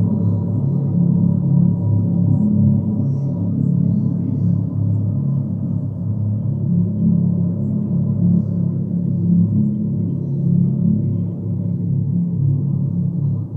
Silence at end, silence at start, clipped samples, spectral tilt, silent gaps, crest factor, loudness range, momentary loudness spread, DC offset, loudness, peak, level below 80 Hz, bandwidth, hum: 0 s; 0 s; under 0.1%; -14.5 dB/octave; none; 12 dB; 3 LU; 5 LU; under 0.1%; -18 LUFS; -4 dBFS; -46 dBFS; 1.3 kHz; none